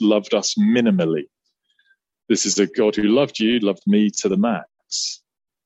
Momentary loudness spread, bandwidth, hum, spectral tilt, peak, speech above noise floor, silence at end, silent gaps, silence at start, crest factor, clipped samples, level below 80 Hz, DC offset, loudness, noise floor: 9 LU; 8.2 kHz; none; -4.5 dB/octave; -4 dBFS; 48 dB; 0.5 s; none; 0 s; 16 dB; under 0.1%; -62 dBFS; under 0.1%; -19 LUFS; -67 dBFS